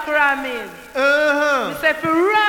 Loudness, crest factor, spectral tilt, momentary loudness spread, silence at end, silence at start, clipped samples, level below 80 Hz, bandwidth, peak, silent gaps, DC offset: -17 LUFS; 14 dB; -3.5 dB/octave; 11 LU; 0 s; 0 s; under 0.1%; -52 dBFS; 19.5 kHz; -4 dBFS; none; under 0.1%